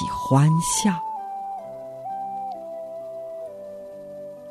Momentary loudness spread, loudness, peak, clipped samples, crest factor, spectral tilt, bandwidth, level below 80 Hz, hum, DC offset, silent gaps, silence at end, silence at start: 19 LU; -25 LUFS; -6 dBFS; under 0.1%; 20 dB; -5.5 dB/octave; 13.5 kHz; -54 dBFS; none; under 0.1%; none; 0 s; 0 s